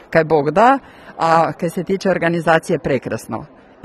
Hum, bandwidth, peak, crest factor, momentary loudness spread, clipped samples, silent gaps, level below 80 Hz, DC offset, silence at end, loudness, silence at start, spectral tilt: none; 13 kHz; 0 dBFS; 16 dB; 12 LU; under 0.1%; none; -50 dBFS; under 0.1%; 0.4 s; -17 LUFS; 0.1 s; -6 dB/octave